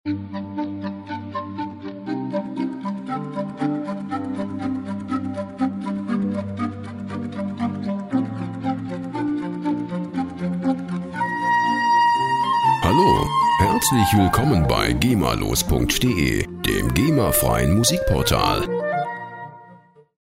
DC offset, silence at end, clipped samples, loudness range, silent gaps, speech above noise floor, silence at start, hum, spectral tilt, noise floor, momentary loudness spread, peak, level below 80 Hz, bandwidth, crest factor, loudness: under 0.1%; 0.45 s; under 0.1%; 9 LU; none; 30 dB; 0.05 s; none; -5 dB/octave; -49 dBFS; 12 LU; -2 dBFS; -36 dBFS; 16 kHz; 18 dB; -22 LUFS